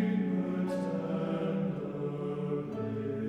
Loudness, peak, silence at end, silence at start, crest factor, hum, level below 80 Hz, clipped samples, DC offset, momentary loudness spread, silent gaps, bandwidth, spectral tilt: -34 LUFS; -20 dBFS; 0 s; 0 s; 12 dB; none; -68 dBFS; under 0.1%; under 0.1%; 4 LU; none; 9.4 kHz; -9 dB/octave